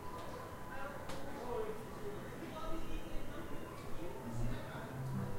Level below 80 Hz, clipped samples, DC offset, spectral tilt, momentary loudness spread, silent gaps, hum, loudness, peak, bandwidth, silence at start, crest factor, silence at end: -48 dBFS; under 0.1%; under 0.1%; -6 dB/octave; 5 LU; none; none; -46 LUFS; -26 dBFS; 16 kHz; 0 s; 14 dB; 0 s